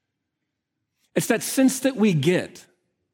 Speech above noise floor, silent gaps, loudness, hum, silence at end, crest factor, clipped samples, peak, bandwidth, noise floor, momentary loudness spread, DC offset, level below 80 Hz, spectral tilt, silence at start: 59 dB; none; -22 LUFS; none; 0.55 s; 18 dB; under 0.1%; -6 dBFS; 17.5 kHz; -81 dBFS; 8 LU; under 0.1%; -72 dBFS; -5 dB/octave; 1.15 s